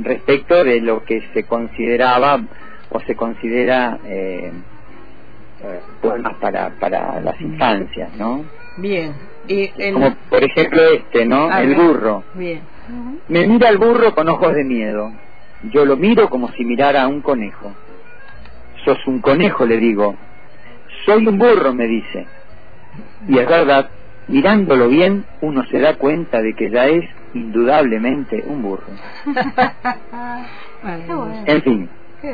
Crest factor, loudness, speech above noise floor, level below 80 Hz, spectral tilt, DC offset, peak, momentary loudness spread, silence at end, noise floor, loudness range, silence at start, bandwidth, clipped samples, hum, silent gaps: 14 dB; -15 LUFS; 27 dB; -46 dBFS; -8.5 dB/octave; 4%; -2 dBFS; 18 LU; 0 s; -42 dBFS; 7 LU; 0 s; 5 kHz; under 0.1%; none; none